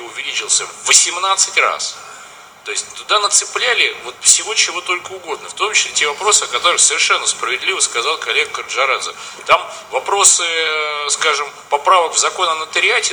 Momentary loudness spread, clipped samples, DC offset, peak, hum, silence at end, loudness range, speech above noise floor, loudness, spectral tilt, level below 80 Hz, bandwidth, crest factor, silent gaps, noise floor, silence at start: 12 LU; under 0.1%; under 0.1%; 0 dBFS; none; 0 s; 2 LU; 22 dB; -14 LUFS; 2 dB/octave; -62 dBFS; over 20 kHz; 16 dB; none; -38 dBFS; 0 s